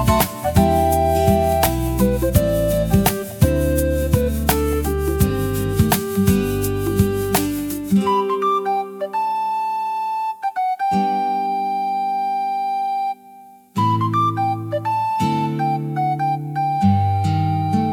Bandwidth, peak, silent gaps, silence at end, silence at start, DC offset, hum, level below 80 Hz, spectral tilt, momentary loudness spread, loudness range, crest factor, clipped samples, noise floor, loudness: 18 kHz; 0 dBFS; none; 0 s; 0 s; under 0.1%; none; -32 dBFS; -6 dB/octave; 6 LU; 4 LU; 18 dB; under 0.1%; -44 dBFS; -19 LUFS